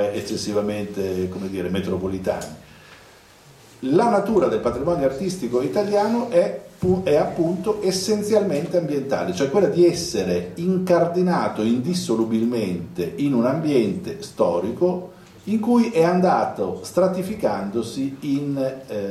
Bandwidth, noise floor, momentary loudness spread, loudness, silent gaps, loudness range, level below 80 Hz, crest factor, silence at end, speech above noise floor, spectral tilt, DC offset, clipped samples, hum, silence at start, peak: 14.5 kHz; -49 dBFS; 8 LU; -22 LUFS; none; 3 LU; -52 dBFS; 16 dB; 0 s; 28 dB; -6 dB/octave; under 0.1%; under 0.1%; none; 0 s; -4 dBFS